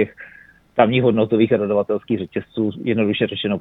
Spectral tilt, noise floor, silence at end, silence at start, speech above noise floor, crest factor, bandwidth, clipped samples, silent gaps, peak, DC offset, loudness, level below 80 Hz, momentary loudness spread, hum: -9.5 dB/octave; -47 dBFS; 0 s; 0 s; 29 dB; 18 dB; 4 kHz; under 0.1%; none; -2 dBFS; under 0.1%; -19 LUFS; -56 dBFS; 8 LU; none